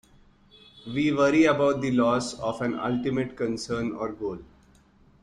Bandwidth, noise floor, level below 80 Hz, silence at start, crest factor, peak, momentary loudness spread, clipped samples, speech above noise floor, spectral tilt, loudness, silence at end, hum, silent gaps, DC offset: 11 kHz; -58 dBFS; -56 dBFS; 0.75 s; 18 dB; -8 dBFS; 14 LU; under 0.1%; 33 dB; -6 dB/octave; -26 LUFS; 0.75 s; none; none; under 0.1%